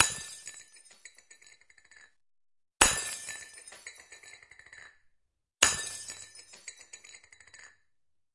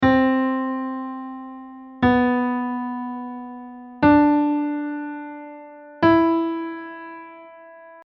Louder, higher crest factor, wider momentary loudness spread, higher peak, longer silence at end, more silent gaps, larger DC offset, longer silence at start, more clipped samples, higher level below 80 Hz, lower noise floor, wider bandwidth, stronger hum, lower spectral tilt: second, -28 LUFS vs -21 LUFS; first, 36 dB vs 16 dB; first, 28 LU vs 22 LU; first, 0 dBFS vs -6 dBFS; first, 0.65 s vs 0.05 s; neither; neither; about the same, 0 s vs 0 s; neither; second, -56 dBFS vs -50 dBFS; first, -82 dBFS vs -44 dBFS; first, 11.5 kHz vs 5.8 kHz; neither; second, 0 dB/octave vs -9 dB/octave